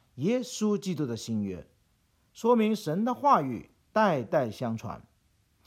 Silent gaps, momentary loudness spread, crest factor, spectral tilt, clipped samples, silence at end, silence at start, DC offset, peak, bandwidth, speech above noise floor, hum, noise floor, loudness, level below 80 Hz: none; 13 LU; 20 dB; -6 dB/octave; under 0.1%; 0.65 s; 0.15 s; under 0.1%; -8 dBFS; 15 kHz; 41 dB; none; -69 dBFS; -28 LUFS; -66 dBFS